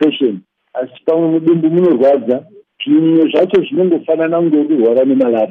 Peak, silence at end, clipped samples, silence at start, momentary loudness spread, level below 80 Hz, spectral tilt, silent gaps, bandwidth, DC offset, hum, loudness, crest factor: -2 dBFS; 0 s; under 0.1%; 0 s; 9 LU; -64 dBFS; -9 dB/octave; none; 4.1 kHz; under 0.1%; none; -13 LUFS; 10 dB